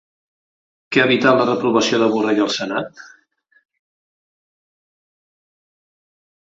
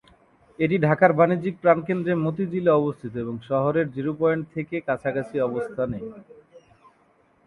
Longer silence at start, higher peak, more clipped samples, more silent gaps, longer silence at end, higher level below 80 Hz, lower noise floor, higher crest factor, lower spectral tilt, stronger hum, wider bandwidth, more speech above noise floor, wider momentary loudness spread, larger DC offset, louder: first, 0.9 s vs 0.6 s; about the same, -2 dBFS vs -4 dBFS; neither; neither; first, 3.45 s vs 0.9 s; about the same, -64 dBFS vs -60 dBFS; about the same, -59 dBFS vs -61 dBFS; about the same, 20 dB vs 22 dB; second, -4.5 dB/octave vs -9.5 dB/octave; neither; second, 7.8 kHz vs 10 kHz; first, 43 dB vs 38 dB; about the same, 10 LU vs 11 LU; neither; first, -17 LUFS vs -23 LUFS